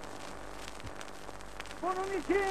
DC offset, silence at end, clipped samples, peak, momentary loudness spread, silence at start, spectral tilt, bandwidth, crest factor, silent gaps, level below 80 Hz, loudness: 0.5%; 0 s; under 0.1%; -18 dBFS; 14 LU; 0 s; -4 dB/octave; 15 kHz; 18 dB; none; -54 dBFS; -39 LUFS